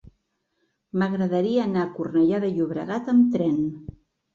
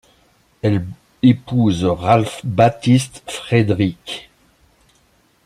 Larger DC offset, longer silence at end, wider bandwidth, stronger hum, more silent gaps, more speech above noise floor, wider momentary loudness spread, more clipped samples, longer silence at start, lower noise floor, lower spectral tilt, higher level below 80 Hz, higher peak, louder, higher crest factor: neither; second, 0.5 s vs 1.25 s; second, 7.2 kHz vs 13 kHz; neither; neither; first, 51 dB vs 41 dB; second, 10 LU vs 14 LU; neither; first, 0.95 s vs 0.65 s; first, -73 dBFS vs -57 dBFS; first, -8.5 dB/octave vs -6.5 dB/octave; second, -58 dBFS vs -50 dBFS; second, -10 dBFS vs -2 dBFS; second, -23 LUFS vs -17 LUFS; about the same, 14 dB vs 16 dB